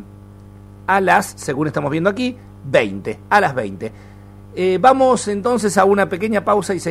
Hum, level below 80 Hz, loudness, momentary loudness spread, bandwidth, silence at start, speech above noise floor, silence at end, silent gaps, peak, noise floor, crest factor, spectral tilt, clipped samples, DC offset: 50 Hz at -40 dBFS; -48 dBFS; -17 LUFS; 14 LU; 15.5 kHz; 0 s; 23 dB; 0 s; none; 0 dBFS; -39 dBFS; 18 dB; -5 dB/octave; under 0.1%; under 0.1%